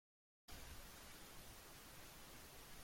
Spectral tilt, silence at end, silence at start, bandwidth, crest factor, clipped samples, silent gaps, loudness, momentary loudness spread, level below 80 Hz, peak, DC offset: -2.5 dB/octave; 0 s; 0.5 s; 16.5 kHz; 16 dB; under 0.1%; none; -58 LUFS; 1 LU; -66 dBFS; -42 dBFS; under 0.1%